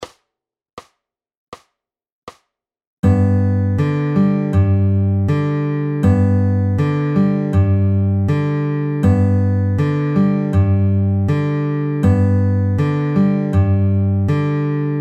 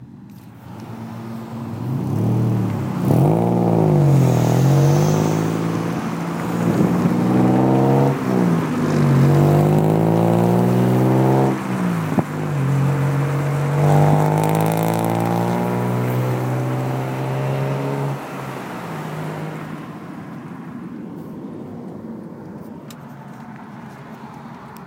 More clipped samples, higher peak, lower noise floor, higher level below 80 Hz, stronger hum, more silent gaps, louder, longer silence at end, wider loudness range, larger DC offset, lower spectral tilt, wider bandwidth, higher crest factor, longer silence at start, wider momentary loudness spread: neither; about the same, -4 dBFS vs -4 dBFS; first, -84 dBFS vs -39 dBFS; first, -42 dBFS vs -52 dBFS; neither; first, 0.73-0.77 s, 1.37-1.52 s, 2.12-2.27 s, 2.87-3.03 s vs none; about the same, -16 LUFS vs -18 LUFS; about the same, 0 s vs 0 s; second, 3 LU vs 17 LU; neither; first, -10 dB/octave vs -8 dB/octave; second, 4.9 kHz vs 17 kHz; about the same, 12 dB vs 14 dB; about the same, 0 s vs 0 s; second, 4 LU vs 20 LU